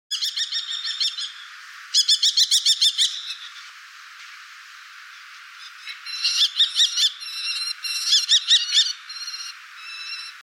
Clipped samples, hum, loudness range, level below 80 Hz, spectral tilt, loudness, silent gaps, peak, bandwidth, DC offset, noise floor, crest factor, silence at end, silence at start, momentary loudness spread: under 0.1%; none; 8 LU; under -90 dBFS; 12 dB/octave; -19 LUFS; none; -8 dBFS; 16.5 kHz; under 0.1%; -43 dBFS; 18 dB; 0.15 s; 0.1 s; 25 LU